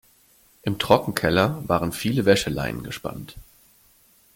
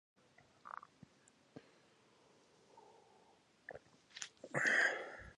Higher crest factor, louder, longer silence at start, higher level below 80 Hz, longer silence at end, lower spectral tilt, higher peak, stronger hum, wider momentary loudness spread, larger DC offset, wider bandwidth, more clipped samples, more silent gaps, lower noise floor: about the same, 24 dB vs 24 dB; first, -23 LUFS vs -37 LUFS; about the same, 0.65 s vs 0.65 s; first, -48 dBFS vs -76 dBFS; first, 0.95 s vs 0.05 s; first, -5 dB/octave vs -2.5 dB/octave; first, -2 dBFS vs -22 dBFS; neither; second, 13 LU vs 29 LU; neither; first, 17 kHz vs 11 kHz; neither; neither; second, -58 dBFS vs -70 dBFS